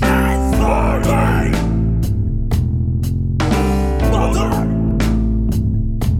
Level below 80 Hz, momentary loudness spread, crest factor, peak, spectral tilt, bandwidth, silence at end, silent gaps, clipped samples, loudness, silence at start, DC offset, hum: -20 dBFS; 4 LU; 12 dB; -2 dBFS; -7 dB/octave; 16 kHz; 0 s; none; under 0.1%; -17 LUFS; 0 s; under 0.1%; none